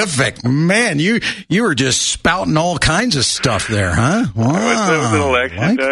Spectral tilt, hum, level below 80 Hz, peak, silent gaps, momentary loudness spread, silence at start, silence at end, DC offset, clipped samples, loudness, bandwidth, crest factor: -4 dB/octave; none; -36 dBFS; -2 dBFS; none; 3 LU; 0 s; 0 s; under 0.1%; under 0.1%; -15 LUFS; 11.5 kHz; 14 dB